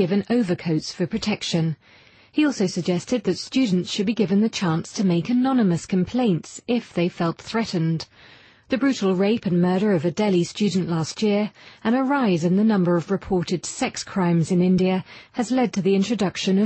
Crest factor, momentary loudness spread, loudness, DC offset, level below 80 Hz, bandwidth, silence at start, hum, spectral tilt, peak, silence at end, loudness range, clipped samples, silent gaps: 14 dB; 7 LU; -22 LUFS; under 0.1%; -56 dBFS; 8.8 kHz; 0 s; none; -6 dB/octave; -8 dBFS; 0 s; 3 LU; under 0.1%; none